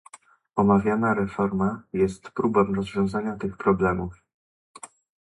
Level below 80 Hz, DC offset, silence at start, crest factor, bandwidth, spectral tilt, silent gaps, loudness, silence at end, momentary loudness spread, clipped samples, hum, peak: -50 dBFS; under 0.1%; 0.55 s; 20 dB; 11.5 kHz; -8 dB/octave; 4.34-4.74 s; -24 LUFS; 0.4 s; 15 LU; under 0.1%; none; -6 dBFS